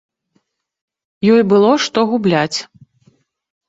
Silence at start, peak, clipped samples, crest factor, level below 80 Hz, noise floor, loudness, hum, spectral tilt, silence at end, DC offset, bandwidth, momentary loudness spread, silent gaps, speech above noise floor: 1.2 s; -2 dBFS; under 0.1%; 16 dB; -58 dBFS; -65 dBFS; -14 LUFS; none; -5.5 dB/octave; 1.05 s; under 0.1%; 7.8 kHz; 8 LU; none; 52 dB